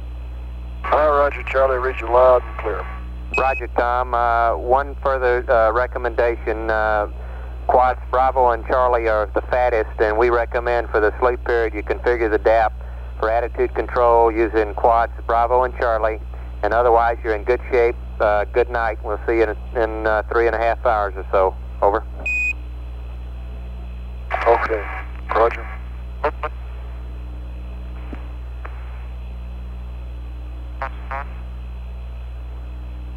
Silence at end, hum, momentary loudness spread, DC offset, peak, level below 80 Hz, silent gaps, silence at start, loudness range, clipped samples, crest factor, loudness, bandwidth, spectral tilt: 0 s; 60 Hz at -30 dBFS; 17 LU; under 0.1%; -4 dBFS; -30 dBFS; none; 0 s; 14 LU; under 0.1%; 16 dB; -19 LUFS; 8 kHz; -7.5 dB/octave